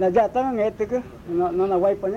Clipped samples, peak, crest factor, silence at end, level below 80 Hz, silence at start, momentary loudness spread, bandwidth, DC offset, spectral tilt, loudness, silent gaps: under 0.1%; -8 dBFS; 14 dB; 0 s; -50 dBFS; 0 s; 7 LU; 7.4 kHz; under 0.1%; -8 dB/octave; -23 LUFS; none